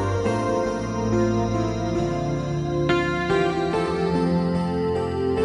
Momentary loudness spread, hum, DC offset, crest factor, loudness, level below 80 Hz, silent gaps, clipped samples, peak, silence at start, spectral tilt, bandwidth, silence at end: 4 LU; none; under 0.1%; 14 dB; -23 LUFS; -40 dBFS; none; under 0.1%; -10 dBFS; 0 s; -7 dB/octave; 11 kHz; 0 s